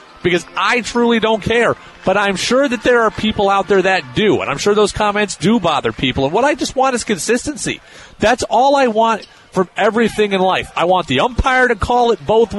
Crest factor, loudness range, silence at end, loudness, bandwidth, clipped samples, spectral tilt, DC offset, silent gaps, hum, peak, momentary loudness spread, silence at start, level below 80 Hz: 12 dB; 2 LU; 0 s; -15 LUFS; 11.5 kHz; under 0.1%; -4 dB/octave; under 0.1%; none; none; -2 dBFS; 4 LU; 0.25 s; -36 dBFS